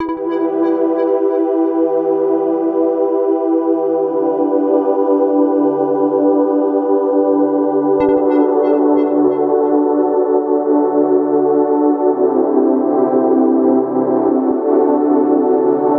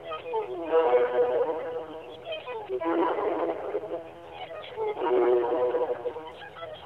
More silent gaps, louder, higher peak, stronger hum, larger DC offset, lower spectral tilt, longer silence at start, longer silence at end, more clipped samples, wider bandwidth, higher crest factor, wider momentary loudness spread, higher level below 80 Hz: neither; first, -14 LUFS vs -28 LUFS; first, -2 dBFS vs -12 dBFS; neither; neither; first, -10.5 dB/octave vs -7 dB/octave; about the same, 0 s vs 0 s; about the same, 0 s vs 0 s; neither; second, 3.4 kHz vs 4.7 kHz; about the same, 12 dB vs 16 dB; second, 2 LU vs 17 LU; first, -60 dBFS vs -68 dBFS